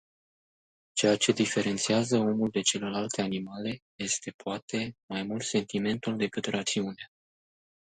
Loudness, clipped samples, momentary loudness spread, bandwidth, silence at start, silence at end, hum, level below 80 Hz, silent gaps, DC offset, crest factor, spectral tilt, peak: -29 LUFS; under 0.1%; 11 LU; 9.6 kHz; 0.95 s; 0.8 s; none; -68 dBFS; 3.82-3.99 s, 4.34-4.39 s, 4.62-4.68 s, 5.03-5.08 s; under 0.1%; 22 dB; -3.5 dB/octave; -10 dBFS